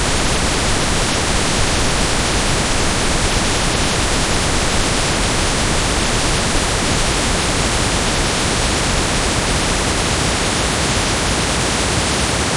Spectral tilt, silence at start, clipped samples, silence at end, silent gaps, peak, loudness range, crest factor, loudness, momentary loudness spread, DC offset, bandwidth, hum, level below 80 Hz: -3 dB/octave; 0 s; under 0.1%; 0 s; none; -2 dBFS; 0 LU; 14 dB; -16 LUFS; 0 LU; under 0.1%; 11.5 kHz; none; -24 dBFS